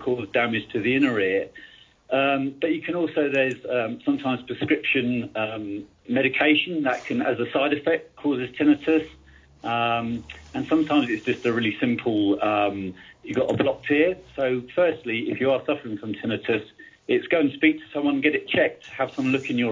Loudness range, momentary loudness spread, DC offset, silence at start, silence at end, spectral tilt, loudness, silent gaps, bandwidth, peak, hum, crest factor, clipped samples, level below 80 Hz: 2 LU; 8 LU; under 0.1%; 0 s; 0 s; -6.5 dB/octave; -24 LUFS; none; 7.6 kHz; -6 dBFS; none; 18 dB; under 0.1%; -58 dBFS